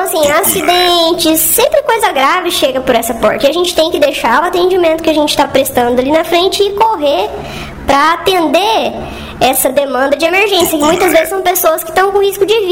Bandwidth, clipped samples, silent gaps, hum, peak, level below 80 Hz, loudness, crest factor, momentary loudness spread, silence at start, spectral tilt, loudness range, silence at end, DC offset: 18 kHz; under 0.1%; none; none; 0 dBFS; -38 dBFS; -10 LUFS; 10 dB; 4 LU; 0 s; -2.5 dB/octave; 2 LU; 0 s; 0.4%